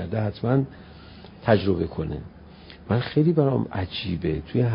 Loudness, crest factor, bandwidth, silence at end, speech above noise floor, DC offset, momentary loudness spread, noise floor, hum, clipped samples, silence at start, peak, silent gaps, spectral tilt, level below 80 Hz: -25 LUFS; 20 dB; 5.4 kHz; 0 s; 22 dB; under 0.1%; 23 LU; -45 dBFS; none; under 0.1%; 0 s; -4 dBFS; none; -12 dB/octave; -42 dBFS